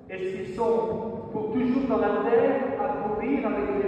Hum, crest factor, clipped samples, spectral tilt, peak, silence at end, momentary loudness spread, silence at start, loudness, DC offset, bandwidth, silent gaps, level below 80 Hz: none; 14 dB; under 0.1%; -8 dB/octave; -12 dBFS; 0 s; 10 LU; 0 s; -26 LUFS; under 0.1%; 8.4 kHz; none; -54 dBFS